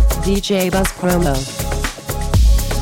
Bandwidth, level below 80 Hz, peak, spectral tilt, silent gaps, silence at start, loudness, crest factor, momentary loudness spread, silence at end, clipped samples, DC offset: 17 kHz; -18 dBFS; -4 dBFS; -5 dB/octave; none; 0 s; -18 LUFS; 12 dB; 7 LU; 0 s; under 0.1%; under 0.1%